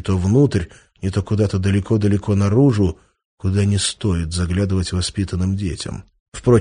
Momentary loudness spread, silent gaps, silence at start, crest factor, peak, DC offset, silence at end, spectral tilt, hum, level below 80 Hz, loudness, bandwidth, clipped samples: 12 LU; 3.25-3.38 s, 6.20-6.32 s; 0.05 s; 16 dB; -2 dBFS; under 0.1%; 0 s; -6.5 dB/octave; none; -36 dBFS; -19 LUFS; 10 kHz; under 0.1%